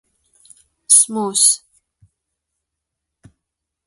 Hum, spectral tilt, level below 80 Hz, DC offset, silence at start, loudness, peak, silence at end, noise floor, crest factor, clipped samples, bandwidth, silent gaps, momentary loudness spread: none; -1 dB/octave; -68 dBFS; under 0.1%; 0.9 s; -13 LUFS; 0 dBFS; 2.3 s; -80 dBFS; 22 dB; under 0.1%; 16 kHz; none; 7 LU